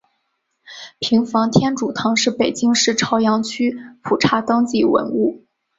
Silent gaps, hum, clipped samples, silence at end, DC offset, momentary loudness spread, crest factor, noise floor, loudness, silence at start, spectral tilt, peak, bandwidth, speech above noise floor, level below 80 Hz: none; none; under 0.1%; 0.4 s; under 0.1%; 7 LU; 16 dB; -71 dBFS; -18 LUFS; 0.7 s; -4 dB/octave; -2 dBFS; 8 kHz; 53 dB; -56 dBFS